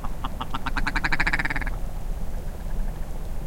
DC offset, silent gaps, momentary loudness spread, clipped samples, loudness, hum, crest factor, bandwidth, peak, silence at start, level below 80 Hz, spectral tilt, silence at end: 1%; none; 13 LU; under 0.1%; -29 LUFS; none; 18 dB; 16.5 kHz; -6 dBFS; 0 s; -28 dBFS; -4.5 dB/octave; 0 s